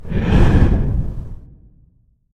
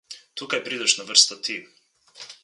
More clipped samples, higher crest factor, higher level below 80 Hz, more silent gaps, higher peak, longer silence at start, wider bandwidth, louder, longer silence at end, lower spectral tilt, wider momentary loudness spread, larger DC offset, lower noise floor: neither; second, 16 dB vs 26 dB; first, -20 dBFS vs -82 dBFS; neither; about the same, 0 dBFS vs 0 dBFS; about the same, 0 s vs 0.1 s; second, 8.2 kHz vs 11.5 kHz; first, -17 LUFS vs -20 LUFS; first, 0.95 s vs 0.1 s; first, -8.5 dB/octave vs 1 dB/octave; about the same, 18 LU vs 20 LU; neither; first, -55 dBFS vs -46 dBFS